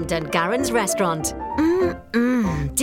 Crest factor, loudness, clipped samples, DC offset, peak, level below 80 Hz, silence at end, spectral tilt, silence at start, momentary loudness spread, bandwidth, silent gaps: 16 dB; -21 LUFS; under 0.1%; under 0.1%; -4 dBFS; -40 dBFS; 0 s; -4.5 dB/octave; 0 s; 3 LU; 17 kHz; none